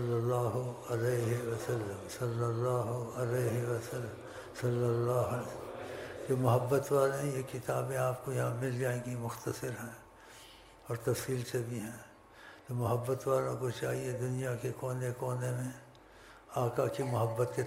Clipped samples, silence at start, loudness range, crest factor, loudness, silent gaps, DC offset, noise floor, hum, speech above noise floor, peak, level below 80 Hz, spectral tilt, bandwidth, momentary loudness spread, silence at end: under 0.1%; 0 s; 5 LU; 20 dB; -35 LUFS; none; under 0.1%; -56 dBFS; none; 22 dB; -16 dBFS; -66 dBFS; -6.5 dB/octave; 16 kHz; 13 LU; 0 s